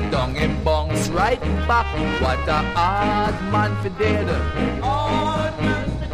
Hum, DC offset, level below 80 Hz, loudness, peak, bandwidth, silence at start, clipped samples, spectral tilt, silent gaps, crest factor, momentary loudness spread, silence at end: none; under 0.1%; -28 dBFS; -21 LUFS; -4 dBFS; 15.5 kHz; 0 s; under 0.1%; -6 dB/octave; none; 16 dB; 3 LU; 0 s